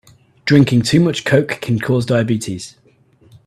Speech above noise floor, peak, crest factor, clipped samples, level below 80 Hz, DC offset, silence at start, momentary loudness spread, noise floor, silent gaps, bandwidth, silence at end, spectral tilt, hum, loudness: 37 dB; 0 dBFS; 16 dB; under 0.1%; -50 dBFS; under 0.1%; 0.45 s; 14 LU; -52 dBFS; none; 14 kHz; 0.75 s; -6 dB/octave; none; -16 LUFS